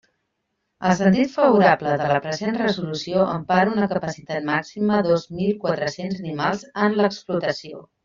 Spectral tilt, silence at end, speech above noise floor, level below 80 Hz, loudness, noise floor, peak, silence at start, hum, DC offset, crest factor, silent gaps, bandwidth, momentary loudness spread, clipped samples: -5 dB/octave; 0.25 s; 55 dB; -58 dBFS; -21 LUFS; -75 dBFS; -2 dBFS; 0.8 s; none; under 0.1%; 18 dB; none; 7.6 kHz; 9 LU; under 0.1%